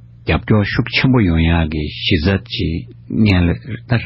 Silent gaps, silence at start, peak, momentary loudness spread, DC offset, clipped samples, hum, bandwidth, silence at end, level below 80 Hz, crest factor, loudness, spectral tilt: none; 0.2 s; 0 dBFS; 8 LU; under 0.1%; under 0.1%; none; 5.8 kHz; 0 s; -28 dBFS; 16 dB; -16 LUFS; -5.5 dB/octave